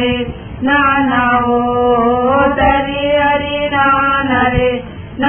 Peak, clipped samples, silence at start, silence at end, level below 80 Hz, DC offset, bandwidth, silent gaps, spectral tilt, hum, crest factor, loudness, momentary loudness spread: 0 dBFS; under 0.1%; 0 s; 0 s; -32 dBFS; under 0.1%; 3.5 kHz; none; -9.5 dB/octave; none; 12 dB; -13 LUFS; 6 LU